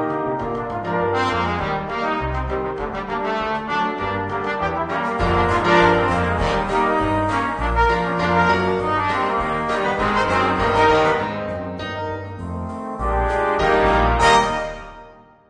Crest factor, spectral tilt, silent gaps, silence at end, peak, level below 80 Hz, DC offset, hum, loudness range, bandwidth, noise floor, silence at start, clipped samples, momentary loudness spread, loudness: 18 dB; -5.5 dB/octave; none; 0.35 s; -2 dBFS; -32 dBFS; under 0.1%; none; 5 LU; 10 kHz; -44 dBFS; 0 s; under 0.1%; 11 LU; -20 LUFS